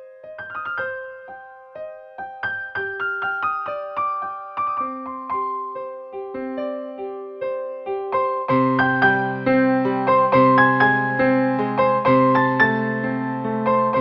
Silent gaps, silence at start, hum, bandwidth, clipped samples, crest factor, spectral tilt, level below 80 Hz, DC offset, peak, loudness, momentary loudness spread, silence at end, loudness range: none; 0 s; none; 5.8 kHz; under 0.1%; 18 dB; -9 dB/octave; -58 dBFS; under 0.1%; -4 dBFS; -20 LUFS; 17 LU; 0 s; 11 LU